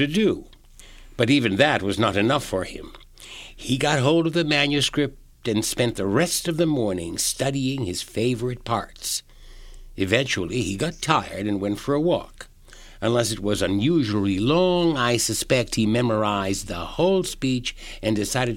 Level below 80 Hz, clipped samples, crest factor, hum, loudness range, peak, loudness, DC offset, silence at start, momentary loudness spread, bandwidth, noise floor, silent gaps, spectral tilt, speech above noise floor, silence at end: -44 dBFS; under 0.1%; 22 dB; none; 4 LU; -2 dBFS; -23 LUFS; under 0.1%; 0 s; 9 LU; 17 kHz; -46 dBFS; none; -4.5 dB/octave; 23 dB; 0 s